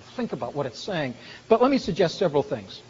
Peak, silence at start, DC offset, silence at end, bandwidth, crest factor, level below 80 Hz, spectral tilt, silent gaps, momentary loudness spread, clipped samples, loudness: -4 dBFS; 0 s; under 0.1%; 0.1 s; 7.6 kHz; 20 dB; -56 dBFS; -4.5 dB/octave; none; 12 LU; under 0.1%; -25 LUFS